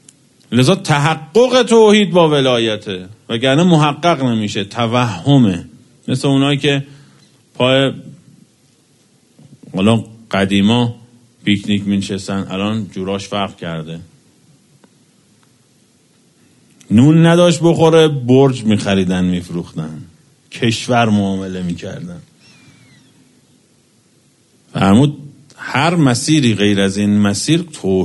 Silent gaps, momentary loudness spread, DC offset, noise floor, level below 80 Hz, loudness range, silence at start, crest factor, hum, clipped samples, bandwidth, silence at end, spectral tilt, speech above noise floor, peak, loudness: none; 16 LU; under 0.1%; -54 dBFS; -52 dBFS; 11 LU; 0.5 s; 16 dB; none; under 0.1%; 11.5 kHz; 0 s; -6 dB/octave; 40 dB; 0 dBFS; -14 LUFS